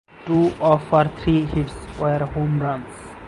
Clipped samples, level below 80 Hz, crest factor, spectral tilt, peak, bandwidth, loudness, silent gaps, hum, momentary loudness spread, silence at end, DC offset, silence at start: under 0.1%; -40 dBFS; 18 dB; -8 dB/octave; -4 dBFS; 11.5 kHz; -21 LUFS; none; none; 10 LU; 0 s; under 0.1%; 0.2 s